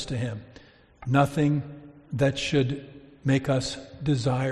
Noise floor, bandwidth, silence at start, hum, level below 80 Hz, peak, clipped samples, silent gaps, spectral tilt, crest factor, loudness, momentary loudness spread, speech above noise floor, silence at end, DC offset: -52 dBFS; 11.5 kHz; 0 s; none; -52 dBFS; -8 dBFS; under 0.1%; none; -6.5 dB/octave; 20 dB; -26 LUFS; 14 LU; 27 dB; 0 s; under 0.1%